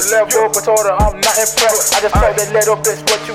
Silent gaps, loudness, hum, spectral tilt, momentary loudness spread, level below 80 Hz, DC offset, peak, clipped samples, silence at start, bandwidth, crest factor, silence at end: none; -12 LUFS; none; -2 dB/octave; 3 LU; -26 dBFS; under 0.1%; -2 dBFS; under 0.1%; 0 s; 16 kHz; 10 dB; 0 s